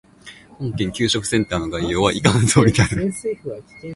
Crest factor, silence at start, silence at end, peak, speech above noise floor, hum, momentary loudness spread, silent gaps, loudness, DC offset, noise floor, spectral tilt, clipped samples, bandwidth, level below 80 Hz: 20 dB; 0.25 s; 0 s; 0 dBFS; 25 dB; none; 15 LU; none; -19 LUFS; under 0.1%; -44 dBFS; -5 dB/octave; under 0.1%; 11.5 kHz; -40 dBFS